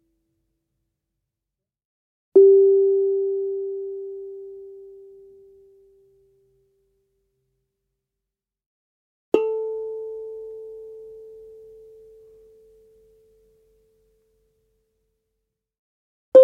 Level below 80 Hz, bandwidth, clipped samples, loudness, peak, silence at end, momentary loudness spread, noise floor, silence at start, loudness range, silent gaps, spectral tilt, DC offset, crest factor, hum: -72 dBFS; 3.5 kHz; under 0.1%; -20 LUFS; -2 dBFS; 0 s; 28 LU; -86 dBFS; 2.35 s; 22 LU; 8.66-9.32 s, 15.79-16.32 s; -7 dB/octave; under 0.1%; 24 dB; none